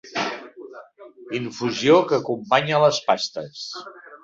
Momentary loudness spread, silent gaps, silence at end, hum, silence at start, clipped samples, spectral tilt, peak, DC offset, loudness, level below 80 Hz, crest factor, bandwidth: 21 LU; none; 0.1 s; none; 0.05 s; under 0.1%; -4.5 dB/octave; -2 dBFS; under 0.1%; -21 LUFS; -66 dBFS; 20 dB; 7.8 kHz